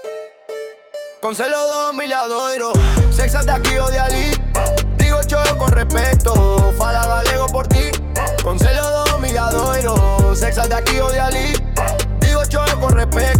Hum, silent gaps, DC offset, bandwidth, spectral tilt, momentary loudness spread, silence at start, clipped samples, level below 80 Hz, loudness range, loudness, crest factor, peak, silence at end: none; none; under 0.1%; 18 kHz; -4.5 dB/octave; 5 LU; 0 s; under 0.1%; -18 dBFS; 2 LU; -16 LUFS; 12 dB; -4 dBFS; 0 s